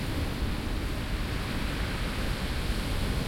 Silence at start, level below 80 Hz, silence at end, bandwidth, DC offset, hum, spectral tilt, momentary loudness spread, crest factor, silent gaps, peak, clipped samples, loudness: 0 s; -34 dBFS; 0 s; 16.5 kHz; under 0.1%; none; -5 dB/octave; 2 LU; 12 dB; none; -18 dBFS; under 0.1%; -32 LUFS